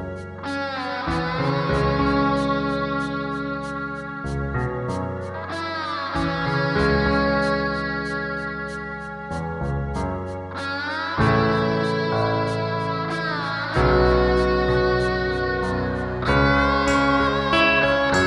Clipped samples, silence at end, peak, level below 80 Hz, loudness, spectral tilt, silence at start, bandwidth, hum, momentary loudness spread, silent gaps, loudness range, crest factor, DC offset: under 0.1%; 0 s; -4 dBFS; -34 dBFS; -22 LUFS; -6.5 dB/octave; 0 s; 11 kHz; none; 11 LU; none; 7 LU; 18 dB; under 0.1%